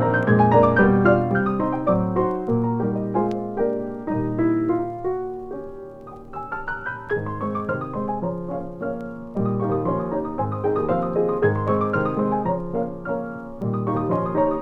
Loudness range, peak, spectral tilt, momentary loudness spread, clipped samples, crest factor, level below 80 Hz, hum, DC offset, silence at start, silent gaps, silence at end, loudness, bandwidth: 8 LU; -4 dBFS; -10.5 dB/octave; 13 LU; under 0.1%; 18 dB; -46 dBFS; none; under 0.1%; 0 s; none; 0 s; -23 LUFS; 5.4 kHz